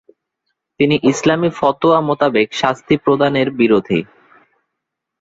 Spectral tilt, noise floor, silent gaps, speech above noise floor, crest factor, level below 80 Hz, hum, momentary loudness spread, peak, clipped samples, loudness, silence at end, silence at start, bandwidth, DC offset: -5.5 dB/octave; -78 dBFS; none; 64 dB; 16 dB; -54 dBFS; none; 4 LU; -2 dBFS; under 0.1%; -15 LUFS; 1.2 s; 0.8 s; 8 kHz; under 0.1%